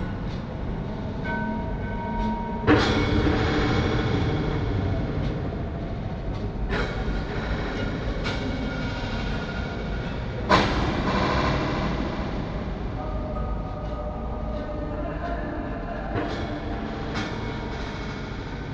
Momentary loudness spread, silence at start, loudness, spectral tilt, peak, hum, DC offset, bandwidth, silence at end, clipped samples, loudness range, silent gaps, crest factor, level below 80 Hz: 9 LU; 0 s; -27 LUFS; -6.5 dB/octave; -6 dBFS; none; under 0.1%; 8 kHz; 0 s; under 0.1%; 7 LU; none; 22 dB; -34 dBFS